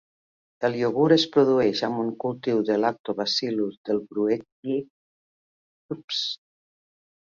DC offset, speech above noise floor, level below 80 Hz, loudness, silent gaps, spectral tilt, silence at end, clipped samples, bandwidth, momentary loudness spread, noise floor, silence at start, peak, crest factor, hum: under 0.1%; over 66 dB; -68 dBFS; -24 LUFS; 3.00-3.04 s, 3.77-3.84 s, 4.52-4.63 s, 4.90-5.89 s, 6.04-6.08 s; -5.5 dB/octave; 0.85 s; under 0.1%; 7.4 kHz; 10 LU; under -90 dBFS; 0.6 s; -6 dBFS; 20 dB; none